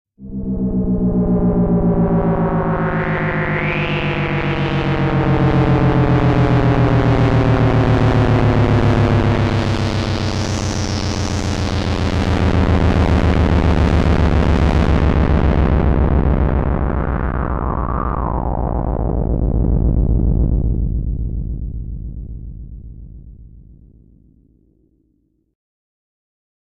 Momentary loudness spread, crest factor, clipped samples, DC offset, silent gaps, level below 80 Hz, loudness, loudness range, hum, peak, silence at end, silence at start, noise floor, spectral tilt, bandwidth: 8 LU; 12 dB; under 0.1%; under 0.1%; none; -22 dBFS; -17 LUFS; 7 LU; none; -4 dBFS; 3.15 s; 0.2 s; -63 dBFS; -7.5 dB/octave; 9.4 kHz